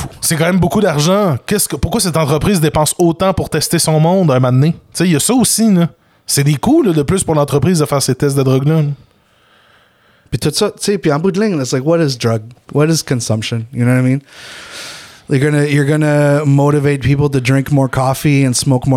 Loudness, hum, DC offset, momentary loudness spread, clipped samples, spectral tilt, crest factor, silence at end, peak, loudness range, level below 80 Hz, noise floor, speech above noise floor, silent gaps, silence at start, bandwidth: -13 LUFS; none; under 0.1%; 7 LU; under 0.1%; -5.5 dB/octave; 10 dB; 0 s; -2 dBFS; 4 LU; -38 dBFS; -52 dBFS; 39 dB; none; 0 s; 16.5 kHz